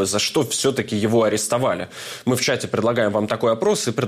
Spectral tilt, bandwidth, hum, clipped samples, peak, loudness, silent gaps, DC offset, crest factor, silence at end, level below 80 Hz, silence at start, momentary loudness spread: -4 dB/octave; 16 kHz; none; under 0.1%; -8 dBFS; -20 LUFS; none; under 0.1%; 12 dB; 0 s; -60 dBFS; 0 s; 5 LU